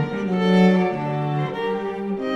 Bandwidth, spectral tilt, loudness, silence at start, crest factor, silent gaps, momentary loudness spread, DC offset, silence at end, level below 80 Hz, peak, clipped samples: 7 kHz; -8 dB/octave; -21 LUFS; 0 s; 16 dB; none; 10 LU; under 0.1%; 0 s; -60 dBFS; -6 dBFS; under 0.1%